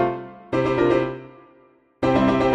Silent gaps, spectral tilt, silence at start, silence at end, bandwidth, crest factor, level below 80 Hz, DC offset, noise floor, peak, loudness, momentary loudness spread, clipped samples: none; -7.5 dB/octave; 0 s; 0 s; 9 kHz; 16 dB; -46 dBFS; under 0.1%; -56 dBFS; -6 dBFS; -21 LUFS; 13 LU; under 0.1%